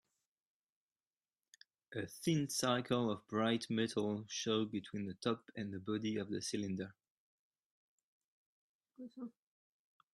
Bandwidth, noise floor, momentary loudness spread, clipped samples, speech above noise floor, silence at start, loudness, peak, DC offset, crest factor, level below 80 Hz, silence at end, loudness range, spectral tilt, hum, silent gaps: 13 kHz; under -90 dBFS; 15 LU; under 0.1%; over 51 dB; 1.9 s; -39 LUFS; -20 dBFS; under 0.1%; 22 dB; -80 dBFS; 0.85 s; 11 LU; -4.5 dB/octave; none; 7.10-7.52 s, 7.62-8.80 s